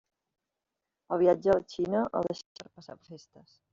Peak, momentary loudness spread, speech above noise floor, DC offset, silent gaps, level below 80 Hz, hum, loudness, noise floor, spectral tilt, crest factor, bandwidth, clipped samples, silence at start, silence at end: -12 dBFS; 23 LU; 57 dB; under 0.1%; 2.46-2.55 s; -64 dBFS; none; -28 LUFS; -87 dBFS; -6 dB/octave; 20 dB; 7.4 kHz; under 0.1%; 1.1 s; 0.55 s